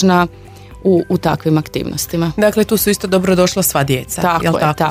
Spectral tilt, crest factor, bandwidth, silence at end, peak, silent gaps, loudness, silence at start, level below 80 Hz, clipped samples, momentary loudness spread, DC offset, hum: -5 dB/octave; 14 dB; 16 kHz; 0 s; 0 dBFS; none; -15 LUFS; 0 s; -40 dBFS; under 0.1%; 6 LU; under 0.1%; none